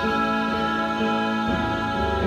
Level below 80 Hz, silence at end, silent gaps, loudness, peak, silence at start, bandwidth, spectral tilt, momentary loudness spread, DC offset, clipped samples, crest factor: -40 dBFS; 0 s; none; -23 LUFS; -12 dBFS; 0 s; 13 kHz; -6 dB/octave; 2 LU; under 0.1%; under 0.1%; 12 dB